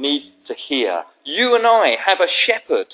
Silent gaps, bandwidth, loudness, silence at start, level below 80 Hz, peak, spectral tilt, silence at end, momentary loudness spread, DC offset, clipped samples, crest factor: none; 4 kHz; -17 LUFS; 0 s; -78 dBFS; -2 dBFS; -5 dB/octave; 0 s; 12 LU; under 0.1%; under 0.1%; 16 dB